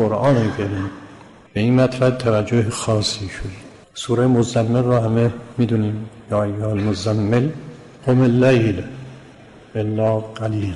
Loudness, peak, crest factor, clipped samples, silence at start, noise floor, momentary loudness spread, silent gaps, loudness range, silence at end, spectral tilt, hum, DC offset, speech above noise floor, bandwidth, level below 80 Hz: -19 LUFS; -6 dBFS; 14 dB; under 0.1%; 0 s; -43 dBFS; 15 LU; none; 1 LU; 0 s; -6.5 dB/octave; none; under 0.1%; 25 dB; 11.5 kHz; -46 dBFS